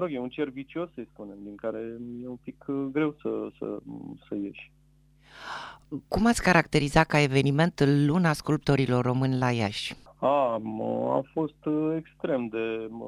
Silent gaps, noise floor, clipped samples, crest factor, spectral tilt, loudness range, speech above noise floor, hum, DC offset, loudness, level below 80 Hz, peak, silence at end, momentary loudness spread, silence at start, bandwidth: none; -60 dBFS; under 0.1%; 22 dB; -6 dB/octave; 11 LU; 33 dB; none; under 0.1%; -27 LUFS; -50 dBFS; -4 dBFS; 0 s; 17 LU; 0 s; 13.5 kHz